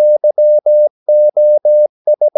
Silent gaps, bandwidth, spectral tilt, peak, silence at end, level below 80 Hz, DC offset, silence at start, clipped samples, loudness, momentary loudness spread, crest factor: 0.90-1.06 s, 1.89-2.05 s; 0.9 kHz; -10.5 dB/octave; -4 dBFS; 0.1 s; -84 dBFS; under 0.1%; 0 s; under 0.1%; -11 LUFS; 3 LU; 6 dB